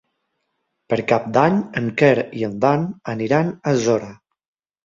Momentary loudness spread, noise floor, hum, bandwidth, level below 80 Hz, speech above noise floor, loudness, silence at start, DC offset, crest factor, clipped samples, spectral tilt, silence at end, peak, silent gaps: 9 LU; -74 dBFS; none; 7.6 kHz; -58 dBFS; 55 dB; -19 LUFS; 0.9 s; under 0.1%; 18 dB; under 0.1%; -6.5 dB/octave; 0.7 s; -2 dBFS; none